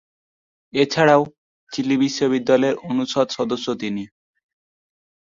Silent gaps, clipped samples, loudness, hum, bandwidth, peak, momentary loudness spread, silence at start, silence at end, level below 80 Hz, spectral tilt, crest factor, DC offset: 1.38-1.67 s; under 0.1%; -20 LUFS; none; 7.6 kHz; -2 dBFS; 13 LU; 0.75 s; 1.35 s; -64 dBFS; -5 dB/octave; 20 dB; under 0.1%